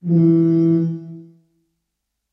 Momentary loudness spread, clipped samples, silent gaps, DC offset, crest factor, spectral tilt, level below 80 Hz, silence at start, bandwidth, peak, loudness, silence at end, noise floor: 17 LU; under 0.1%; none; under 0.1%; 14 dB; -12.5 dB/octave; -72 dBFS; 0.05 s; 3.1 kHz; -6 dBFS; -16 LUFS; 1.1 s; -77 dBFS